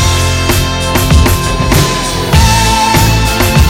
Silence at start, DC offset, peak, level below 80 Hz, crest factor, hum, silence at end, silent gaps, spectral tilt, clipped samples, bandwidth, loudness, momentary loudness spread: 0 s; under 0.1%; 0 dBFS; -14 dBFS; 8 dB; none; 0 s; none; -4 dB/octave; 0.3%; 17 kHz; -9 LUFS; 4 LU